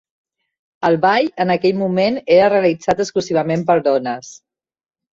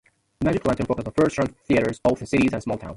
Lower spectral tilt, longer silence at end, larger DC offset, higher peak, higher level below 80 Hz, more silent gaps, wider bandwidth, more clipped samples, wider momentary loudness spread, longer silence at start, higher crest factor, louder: about the same, -6 dB/octave vs -6.5 dB/octave; first, 0.8 s vs 0 s; neither; first, -2 dBFS vs -6 dBFS; second, -56 dBFS vs -44 dBFS; neither; second, 7.8 kHz vs 11.5 kHz; neither; about the same, 6 LU vs 5 LU; first, 0.8 s vs 0.4 s; about the same, 16 dB vs 16 dB; first, -16 LUFS vs -23 LUFS